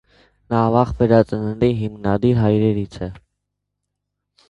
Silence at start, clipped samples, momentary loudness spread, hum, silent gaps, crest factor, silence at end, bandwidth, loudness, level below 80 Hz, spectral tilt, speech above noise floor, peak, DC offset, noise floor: 0.5 s; under 0.1%; 10 LU; 50 Hz at -40 dBFS; none; 20 dB; 1.3 s; 7.8 kHz; -18 LUFS; -40 dBFS; -9.5 dB/octave; 61 dB; 0 dBFS; under 0.1%; -78 dBFS